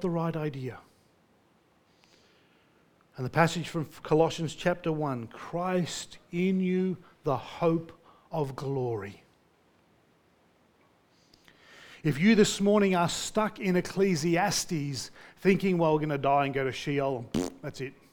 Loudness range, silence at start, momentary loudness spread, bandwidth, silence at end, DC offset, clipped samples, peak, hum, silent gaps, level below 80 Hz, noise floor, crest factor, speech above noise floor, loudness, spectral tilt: 12 LU; 0 s; 13 LU; 19 kHz; 0.2 s; under 0.1%; under 0.1%; -6 dBFS; none; none; -60 dBFS; -66 dBFS; 24 dB; 37 dB; -29 LUFS; -5.5 dB/octave